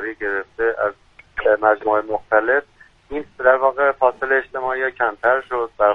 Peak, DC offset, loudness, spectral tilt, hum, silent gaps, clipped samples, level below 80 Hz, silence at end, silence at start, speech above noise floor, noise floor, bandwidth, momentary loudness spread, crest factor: 0 dBFS; under 0.1%; -19 LUFS; -6.5 dB/octave; none; none; under 0.1%; -52 dBFS; 0 s; 0 s; 19 dB; -38 dBFS; 5 kHz; 8 LU; 18 dB